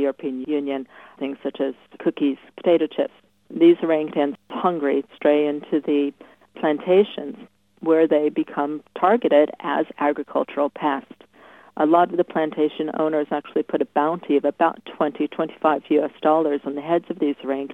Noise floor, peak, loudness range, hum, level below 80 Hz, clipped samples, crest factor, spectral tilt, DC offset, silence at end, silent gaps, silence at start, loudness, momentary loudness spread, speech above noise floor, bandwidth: -49 dBFS; -4 dBFS; 2 LU; none; -74 dBFS; under 0.1%; 18 dB; -8 dB/octave; under 0.1%; 0 s; none; 0 s; -22 LUFS; 10 LU; 28 dB; 4 kHz